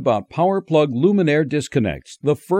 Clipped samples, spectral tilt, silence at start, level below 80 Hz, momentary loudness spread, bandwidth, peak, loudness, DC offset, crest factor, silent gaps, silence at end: under 0.1%; -7 dB/octave; 0 s; -50 dBFS; 6 LU; 16 kHz; -4 dBFS; -19 LUFS; under 0.1%; 14 dB; none; 0 s